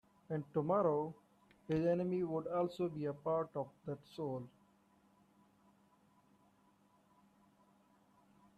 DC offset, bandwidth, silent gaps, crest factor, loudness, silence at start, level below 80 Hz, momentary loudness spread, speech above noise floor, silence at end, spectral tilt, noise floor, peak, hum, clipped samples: under 0.1%; 12.5 kHz; none; 20 dB; -39 LUFS; 0.3 s; -76 dBFS; 12 LU; 34 dB; 4.1 s; -9 dB/octave; -71 dBFS; -22 dBFS; none; under 0.1%